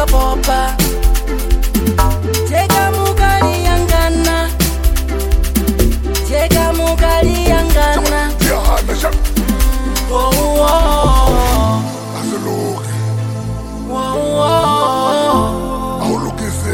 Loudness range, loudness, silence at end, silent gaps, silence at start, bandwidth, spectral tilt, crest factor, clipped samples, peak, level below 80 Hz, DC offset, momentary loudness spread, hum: 2 LU; -14 LUFS; 0 s; none; 0 s; 17 kHz; -5 dB/octave; 12 dB; under 0.1%; 0 dBFS; -16 dBFS; under 0.1%; 7 LU; none